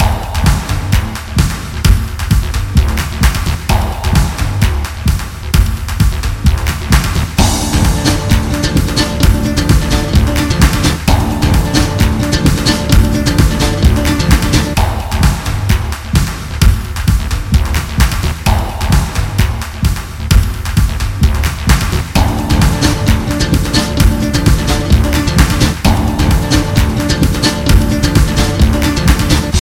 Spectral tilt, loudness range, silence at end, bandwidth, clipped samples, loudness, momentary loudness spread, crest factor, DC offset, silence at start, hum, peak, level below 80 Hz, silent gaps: -5 dB/octave; 3 LU; 0.15 s; 17 kHz; 0.8%; -13 LUFS; 4 LU; 12 dB; under 0.1%; 0 s; none; 0 dBFS; -14 dBFS; none